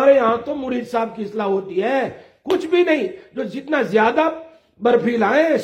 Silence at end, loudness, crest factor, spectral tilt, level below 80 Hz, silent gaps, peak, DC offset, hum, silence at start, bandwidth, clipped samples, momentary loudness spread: 0 s; -19 LUFS; 16 dB; -6 dB/octave; -62 dBFS; none; -2 dBFS; under 0.1%; none; 0 s; 14 kHz; under 0.1%; 12 LU